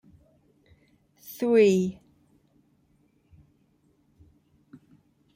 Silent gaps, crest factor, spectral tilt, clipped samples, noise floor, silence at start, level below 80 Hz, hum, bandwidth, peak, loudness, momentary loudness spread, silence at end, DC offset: none; 20 dB; -6.5 dB/octave; under 0.1%; -66 dBFS; 1.3 s; -68 dBFS; none; 16 kHz; -10 dBFS; -23 LUFS; 25 LU; 3.45 s; under 0.1%